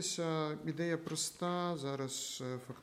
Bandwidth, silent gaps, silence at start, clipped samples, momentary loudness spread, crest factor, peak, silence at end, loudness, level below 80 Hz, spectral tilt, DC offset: 16 kHz; none; 0 s; under 0.1%; 4 LU; 16 dB; -24 dBFS; 0 s; -38 LUFS; -78 dBFS; -4 dB/octave; under 0.1%